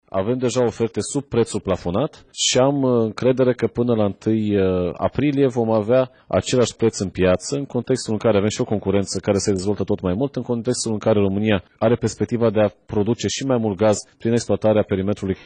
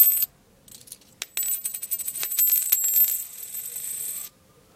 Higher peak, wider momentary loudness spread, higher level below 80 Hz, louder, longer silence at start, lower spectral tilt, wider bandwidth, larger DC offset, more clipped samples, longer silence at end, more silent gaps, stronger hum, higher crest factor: about the same, -6 dBFS vs -4 dBFS; second, 5 LU vs 17 LU; first, -50 dBFS vs -70 dBFS; about the same, -20 LUFS vs -22 LUFS; first, 0.15 s vs 0 s; first, -5.5 dB/octave vs 2 dB/octave; second, 10 kHz vs 17 kHz; neither; neither; second, 0.1 s vs 0.5 s; neither; neither; second, 14 dB vs 22 dB